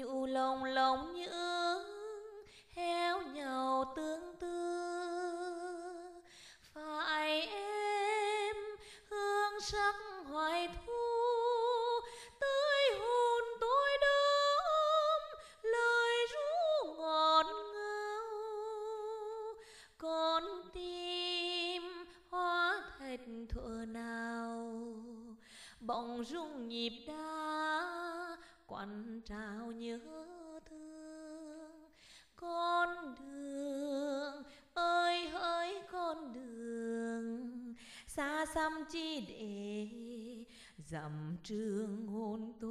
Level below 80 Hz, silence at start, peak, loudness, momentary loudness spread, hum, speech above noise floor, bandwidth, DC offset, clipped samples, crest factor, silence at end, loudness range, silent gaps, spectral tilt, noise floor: -64 dBFS; 0 s; -16 dBFS; -37 LUFS; 19 LU; none; 23 dB; 14.5 kHz; under 0.1%; under 0.1%; 22 dB; 0 s; 11 LU; none; -3.5 dB/octave; -63 dBFS